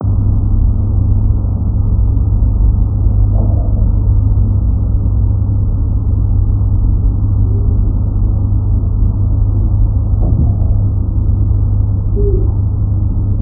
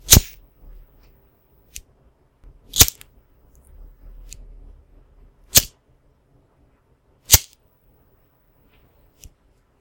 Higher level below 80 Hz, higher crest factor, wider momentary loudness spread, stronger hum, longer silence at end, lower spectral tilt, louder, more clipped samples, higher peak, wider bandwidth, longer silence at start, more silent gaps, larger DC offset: first, -14 dBFS vs -34 dBFS; second, 10 dB vs 24 dB; second, 2 LU vs 28 LU; neither; second, 0 s vs 2.4 s; first, -18.5 dB/octave vs -1.5 dB/octave; about the same, -14 LUFS vs -15 LUFS; neither; about the same, 0 dBFS vs 0 dBFS; second, 1.4 kHz vs 17 kHz; about the same, 0 s vs 0.1 s; neither; neither